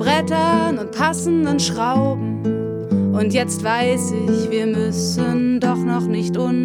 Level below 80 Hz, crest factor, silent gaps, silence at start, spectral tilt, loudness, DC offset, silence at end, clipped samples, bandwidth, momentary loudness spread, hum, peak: -52 dBFS; 16 dB; none; 0 s; -5.5 dB/octave; -19 LUFS; under 0.1%; 0 s; under 0.1%; 16 kHz; 4 LU; none; -2 dBFS